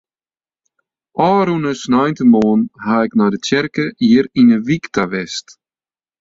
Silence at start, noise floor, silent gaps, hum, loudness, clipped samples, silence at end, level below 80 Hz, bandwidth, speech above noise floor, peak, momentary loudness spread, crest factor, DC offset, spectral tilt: 1.15 s; under -90 dBFS; none; none; -15 LUFS; under 0.1%; 0.8 s; -54 dBFS; 7.8 kHz; over 76 dB; -2 dBFS; 8 LU; 14 dB; under 0.1%; -6 dB/octave